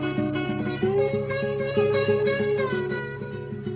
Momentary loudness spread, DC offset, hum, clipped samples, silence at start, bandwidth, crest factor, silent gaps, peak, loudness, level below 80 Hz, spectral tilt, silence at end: 10 LU; under 0.1%; none; under 0.1%; 0 s; 4 kHz; 14 dB; none; -10 dBFS; -25 LUFS; -52 dBFS; -11 dB/octave; 0 s